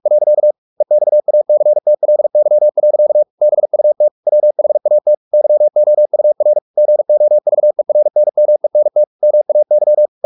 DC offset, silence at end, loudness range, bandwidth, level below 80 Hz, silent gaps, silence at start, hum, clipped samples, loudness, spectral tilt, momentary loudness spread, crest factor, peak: under 0.1%; 0.2 s; 0 LU; 1.1 kHz; -80 dBFS; 0.58-0.76 s, 3.30-3.38 s, 4.11-4.23 s, 5.17-5.31 s, 6.62-6.74 s, 9.07-9.19 s; 0.05 s; none; under 0.1%; -12 LUFS; -11.5 dB/octave; 2 LU; 6 dB; -4 dBFS